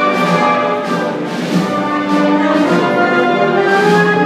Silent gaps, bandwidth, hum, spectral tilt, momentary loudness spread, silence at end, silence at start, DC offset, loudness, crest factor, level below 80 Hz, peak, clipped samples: none; 15 kHz; none; -6 dB/octave; 6 LU; 0 s; 0 s; under 0.1%; -13 LUFS; 12 dB; -60 dBFS; 0 dBFS; under 0.1%